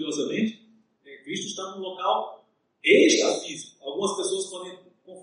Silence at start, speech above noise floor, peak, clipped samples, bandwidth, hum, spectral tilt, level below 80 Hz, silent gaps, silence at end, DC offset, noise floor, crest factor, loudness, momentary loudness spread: 0 s; 34 dB; -6 dBFS; under 0.1%; 11 kHz; none; -2.5 dB/octave; -80 dBFS; none; 0 s; under 0.1%; -58 dBFS; 20 dB; -25 LUFS; 18 LU